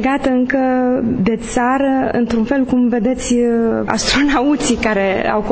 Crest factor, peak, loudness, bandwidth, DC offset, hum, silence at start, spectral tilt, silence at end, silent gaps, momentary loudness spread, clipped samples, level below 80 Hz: 14 dB; 0 dBFS; -15 LUFS; 8 kHz; under 0.1%; none; 0 s; -4.5 dB/octave; 0 s; none; 3 LU; under 0.1%; -36 dBFS